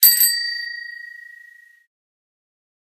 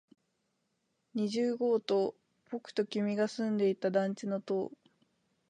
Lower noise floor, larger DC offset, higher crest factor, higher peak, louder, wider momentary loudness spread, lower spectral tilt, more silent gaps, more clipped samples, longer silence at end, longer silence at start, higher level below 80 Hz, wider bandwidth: second, -48 dBFS vs -80 dBFS; neither; about the same, 22 dB vs 18 dB; first, 0 dBFS vs -16 dBFS; first, -17 LUFS vs -33 LUFS; first, 24 LU vs 9 LU; second, 7.5 dB/octave vs -6.5 dB/octave; neither; neither; first, 1.7 s vs 0.8 s; second, 0 s vs 1.15 s; about the same, under -90 dBFS vs -86 dBFS; first, 16 kHz vs 10 kHz